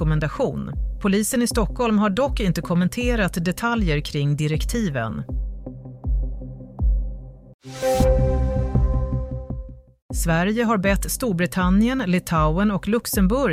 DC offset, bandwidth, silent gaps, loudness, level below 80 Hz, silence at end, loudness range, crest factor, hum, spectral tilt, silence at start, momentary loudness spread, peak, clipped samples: under 0.1%; 15.5 kHz; 7.54-7.59 s, 10.02-10.09 s; -22 LUFS; -28 dBFS; 0 s; 5 LU; 14 dB; none; -6 dB/octave; 0 s; 13 LU; -6 dBFS; under 0.1%